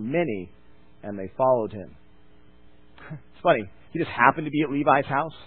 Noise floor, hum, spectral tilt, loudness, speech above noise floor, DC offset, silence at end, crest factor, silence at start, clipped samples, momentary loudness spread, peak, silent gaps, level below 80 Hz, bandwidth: -56 dBFS; none; -10.5 dB/octave; -24 LUFS; 32 dB; 0.4%; 0 s; 24 dB; 0 s; under 0.1%; 22 LU; -2 dBFS; none; -58 dBFS; 4.4 kHz